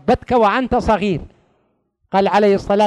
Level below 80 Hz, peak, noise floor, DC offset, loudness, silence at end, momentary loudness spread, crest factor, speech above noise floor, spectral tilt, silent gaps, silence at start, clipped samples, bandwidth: -38 dBFS; -4 dBFS; -64 dBFS; under 0.1%; -16 LUFS; 0 s; 7 LU; 12 dB; 49 dB; -6.5 dB/octave; none; 0.05 s; under 0.1%; 11 kHz